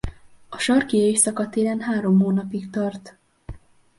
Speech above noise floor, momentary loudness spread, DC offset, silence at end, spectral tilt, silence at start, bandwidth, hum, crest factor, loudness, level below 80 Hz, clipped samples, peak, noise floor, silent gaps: 20 dB; 12 LU; under 0.1%; 0.4 s; -4.5 dB/octave; 0.05 s; 11.5 kHz; none; 18 dB; -21 LUFS; -46 dBFS; under 0.1%; -4 dBFS; -41 dBFS; none